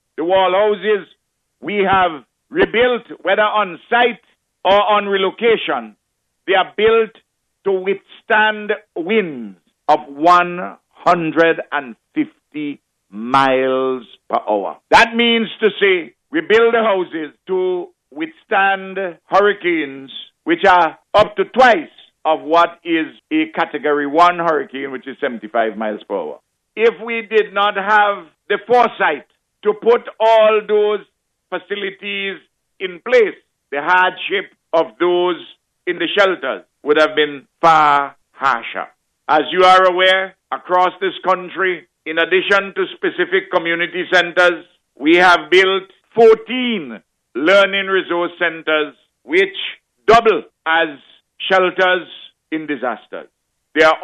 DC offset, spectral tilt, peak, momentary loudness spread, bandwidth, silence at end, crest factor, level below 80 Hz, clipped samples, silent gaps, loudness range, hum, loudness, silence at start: under 0.1%; -4.5 dB/octave; -2 dBFS; 15 LU; 10 kHz; 0 s; 14 dB; -54 dBFS; under 0.1%; none; 4 LU; none; -16 LUFS; 0.2 s